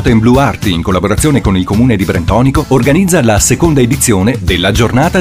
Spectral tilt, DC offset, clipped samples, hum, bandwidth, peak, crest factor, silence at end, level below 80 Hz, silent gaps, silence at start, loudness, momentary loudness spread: -5 dB/octave; under 0.1%; under 0.1%; none; 16.5 kHz; 0 dBFS; 10 dB; 0 s; -22 dBFS; none; 0 s; -10 LUFS; 4 LU